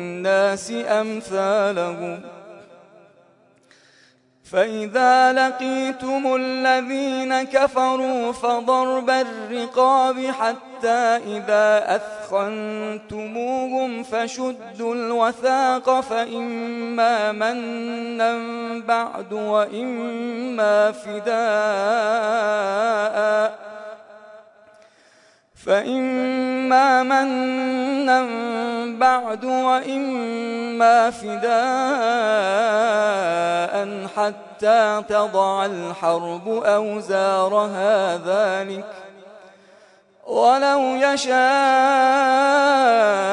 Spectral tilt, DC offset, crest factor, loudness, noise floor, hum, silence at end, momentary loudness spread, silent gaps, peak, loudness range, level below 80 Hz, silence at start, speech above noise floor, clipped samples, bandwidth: -4 dB/octave; under 0.1%; 16 dB; -20 LUFS; -56 dBFS; none; 0 s; 11 LU; none; -4 dBFS; 5 LU; -68 dBFS; 0 s; 37 dB; under 0.1%; 11 kHz